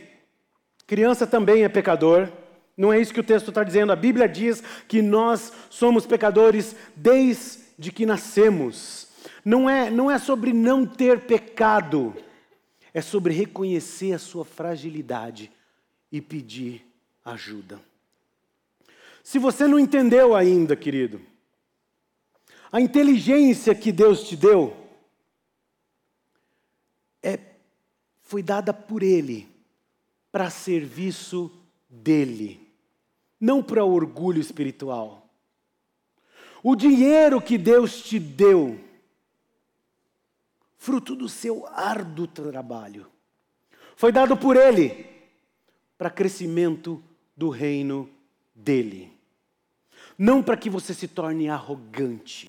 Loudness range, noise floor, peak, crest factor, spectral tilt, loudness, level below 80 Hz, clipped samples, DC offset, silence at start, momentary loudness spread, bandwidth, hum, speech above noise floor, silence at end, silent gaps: 12 LU; -76 dBFS; -8 dBFS; 14 dB; -6 dB/octave; -21 LUFS; -64 dBFS; under 0.1%; under 0.1%; 0.9 s; 18 LU; 16.5 kHz; none; 55 dB; 0.05 s; none